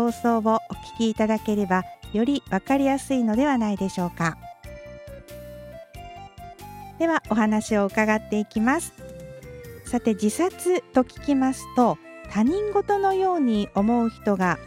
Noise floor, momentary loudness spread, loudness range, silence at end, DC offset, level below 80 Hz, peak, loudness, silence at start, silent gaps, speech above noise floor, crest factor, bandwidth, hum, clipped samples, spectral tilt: -41 dBFS; 19 LU; 6 LU; 0 s; under 0.1%; -50 dBFS; -6 dBFS; -23 LUFS; 0 s; none; 19 dB; 18 dB; 16 kHz; none; under 0.1%; -6 dB/octave